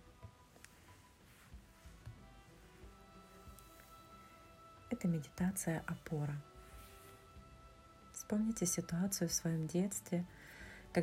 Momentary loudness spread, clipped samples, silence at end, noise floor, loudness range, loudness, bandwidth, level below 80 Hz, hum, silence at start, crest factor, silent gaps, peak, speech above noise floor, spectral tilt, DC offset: 24 LU; under 0.1%; 0 s; -63 dBFS; 20 LU; -40 LUFS; 16 kHz; -64 dBFS; none; 0.05 s; 20 dB; none; -22 dBFS; 25 dB; -5 dB/octave; under 0.1%